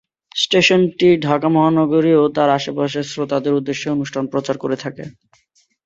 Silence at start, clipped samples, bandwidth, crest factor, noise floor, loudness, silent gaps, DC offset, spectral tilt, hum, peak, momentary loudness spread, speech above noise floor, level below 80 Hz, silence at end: 0.35 s; under 0.1%; 8 kHz; 16 dB; -60 dBFS; -17 LUFS; none; under 0.1%; -5.5 dB/octave; none; 0 dBFS; 10 LU; 44 dB; -60 dBFS; 0.75 s